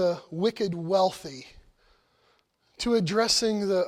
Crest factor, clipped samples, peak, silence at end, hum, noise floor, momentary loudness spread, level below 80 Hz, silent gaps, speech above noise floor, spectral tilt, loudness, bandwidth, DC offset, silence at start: 16 dB; under 0.1%; -12 dBFS; 0 s; none; -67 dBFS; 15 LU; -58 dBFS; none; 41 dB; -4 dB/octave; -26 LUFS; 16 kHz; under 0.1%; 0 s